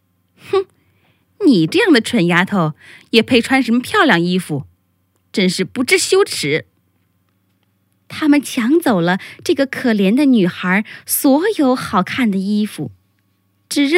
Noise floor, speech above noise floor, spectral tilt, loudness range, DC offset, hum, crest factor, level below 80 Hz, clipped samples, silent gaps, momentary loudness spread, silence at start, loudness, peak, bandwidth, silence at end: -62 dBFS; 47 dB; -4.5 dB/octave; 4 LU; under 0.1%; none; 16 dB; -62 dBFS; under 0.1%; none; 8 LU; 0.45 s; -15 LUFS; 0 dBFS; 16 kHz; 0 s